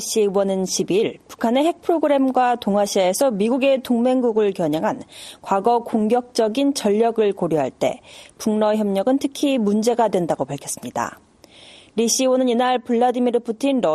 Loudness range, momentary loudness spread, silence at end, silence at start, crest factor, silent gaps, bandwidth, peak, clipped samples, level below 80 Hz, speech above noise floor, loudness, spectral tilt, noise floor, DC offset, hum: 3 LU; 8 LU; 0 s; 0 s; 14 dB; none; 13.5 kHz; -4 dBFS; under 0.1%; -62 dBFS; 28 dB; -20 LUFS; -4.5 dB/octave; -47 dBFS; under 0.1%; none